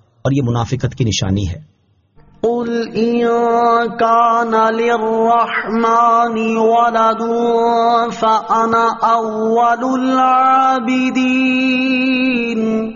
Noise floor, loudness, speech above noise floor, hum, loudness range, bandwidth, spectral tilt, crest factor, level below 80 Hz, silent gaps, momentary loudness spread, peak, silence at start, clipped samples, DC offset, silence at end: -50 dBFS; -14 LUFS; 36 dB; none; 4 LU; 7.2 kHz; -4.5 dB/octave; 12 dB; -44 dBFS; none; 7 LU; -2 dBFS; 0.25 s; under 0.1%; under 0.1%; 0 s